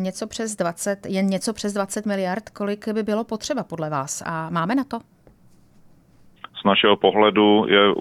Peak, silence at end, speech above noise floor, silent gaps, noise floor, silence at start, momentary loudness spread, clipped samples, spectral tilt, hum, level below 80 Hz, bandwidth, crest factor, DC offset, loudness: -2 dBFS; 0 s; 31 dB; none; -52 dBFS; 0 s; 12 LU; under 0.1%; -4.5 dB/octave; none; -60 dBFS; 14.5 kHz; 20 dB; under 0.1%; -22 LUFS